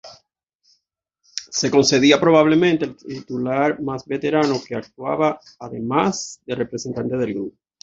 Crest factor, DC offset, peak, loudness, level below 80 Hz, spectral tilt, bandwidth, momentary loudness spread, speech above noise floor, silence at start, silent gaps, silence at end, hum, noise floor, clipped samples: 18 dB; under 0.1%; -2 dBFS; -19 LUFS; -58 dBFS; -4.5 dB/octave; 7.8 kHz; 16 LU; 54 dB; 0.05 s; 0.55-0.59 s; 0.3 s; none; -73 dBFS; under 0.1%